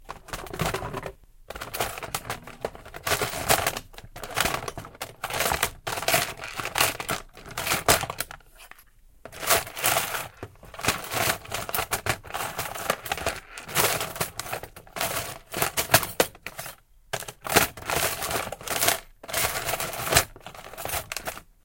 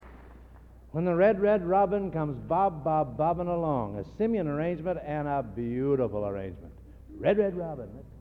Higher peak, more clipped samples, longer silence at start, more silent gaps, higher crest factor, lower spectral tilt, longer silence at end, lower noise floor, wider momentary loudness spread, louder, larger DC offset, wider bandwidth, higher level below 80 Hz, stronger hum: first, 0 dBFS vs -12 dBFS; neither; about the same, 0 s vs 0 s; neither; first, 28 dB vs 18 dB; second, -2 dB/octave vs -10 dB/octave; first, 0.2 s vs 0 s; about the same, -54 dBFS vs -51 dBFS; about the same, 15 LU vs 13 LU; about the same, -26 LUFS vs -28 LUFS; neither; first, 17 kHz vs 5.2 kHz; about the same, -48 dBFS vs -50 dBFS; neither